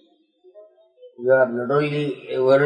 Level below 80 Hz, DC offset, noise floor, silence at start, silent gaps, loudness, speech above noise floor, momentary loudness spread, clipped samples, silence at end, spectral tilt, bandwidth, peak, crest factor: -76 dBFS; under 0.1%; -56 dBFS; 0.55 s; none; -21 LUFS; 37 dB; 8 LU; under 0.1%; 0 s; -8 dB/octave; 8.8 kHz; -6 dBFS; 16 dB